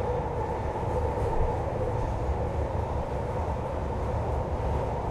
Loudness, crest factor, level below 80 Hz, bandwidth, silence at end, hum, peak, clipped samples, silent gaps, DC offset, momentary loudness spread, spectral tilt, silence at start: -30 LUFS; 14 dB; -34 dBFS; 11 kHz; 0 s; none; -14 dBFS; under 0.1%; none; under 0.1%; 3 LU; -8 dB/octave; 0 s